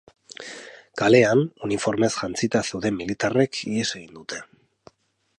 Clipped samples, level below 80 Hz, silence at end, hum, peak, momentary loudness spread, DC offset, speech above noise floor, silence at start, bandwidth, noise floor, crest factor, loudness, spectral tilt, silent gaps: under 0.1%; -58 dBFS; 0.95 s; none; -2 dBFS; 20 LU; under 0.1%; 32 dB; 0.4 s; 11.5 kHz; -55 dBFS; 22 dB; -22 LUFS; -5 dB/octave; none